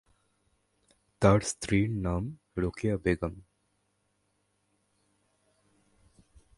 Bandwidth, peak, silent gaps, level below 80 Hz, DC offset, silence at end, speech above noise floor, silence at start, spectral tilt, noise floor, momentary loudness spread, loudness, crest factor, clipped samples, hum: 11.5 kHz; -8 dBFS; none; -48 dBFS; under 0.1%; 3.15 s; 47 dB; 1.2 s; -6 dB/octave; -75 dBFS; 10 LU; -29 LUFS; 24 dB; under 0.1%; 50 Hz at -50 dBFS